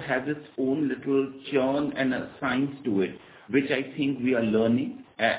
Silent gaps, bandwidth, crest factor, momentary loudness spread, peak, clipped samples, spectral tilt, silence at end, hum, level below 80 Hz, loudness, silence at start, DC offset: none; 4 kHz; 18 dB; 6 LU; -8 dBFS; under 0.1%; -10 dB/octave; 0 s; none; -62 dBFS; -27 LUFS; 0 s; under 0.1%